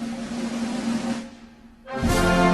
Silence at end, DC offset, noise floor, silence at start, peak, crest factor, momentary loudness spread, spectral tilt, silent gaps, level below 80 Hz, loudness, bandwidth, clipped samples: 0 s; under 0.1%; -47 dBFS; 0 s; -8 dBFS; 18 dB; 15 LU; -5.5 dB/octave; none; -36 dBFS; -25 LUFS; 12.5 kHz; under 0.1%